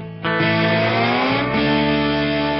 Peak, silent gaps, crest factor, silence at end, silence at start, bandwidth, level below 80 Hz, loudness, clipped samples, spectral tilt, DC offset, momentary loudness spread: -6 dBFS; none; 12 dB; 0 s; 0 s; 6 kHz; -42 dBFS; -18 LUFS; under 0.1%; -7.5 dB/octave; under 0.1%; 2 LU